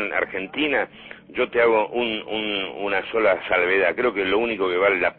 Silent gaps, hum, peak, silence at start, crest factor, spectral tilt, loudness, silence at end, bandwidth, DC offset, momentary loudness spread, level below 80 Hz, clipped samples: none; none; -6 dBFS; 0 s; 16 dB; -8.5 dB/octave; -22 LUFS; 0.05 s; 4.4 kHz; under 0.1%; 7 LU; -56 dBFS; under 0.1%